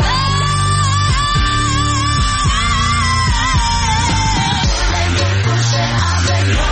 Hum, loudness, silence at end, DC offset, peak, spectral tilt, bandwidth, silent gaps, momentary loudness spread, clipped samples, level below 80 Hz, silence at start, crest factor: none; -14 LUFS; 0 s; under 0.1%; -4 dBFS; -3.5 dB/octave; 8.8 kHz; none; 1 LU; under 0.1%; -22 dBFS; 0 s; 10 dB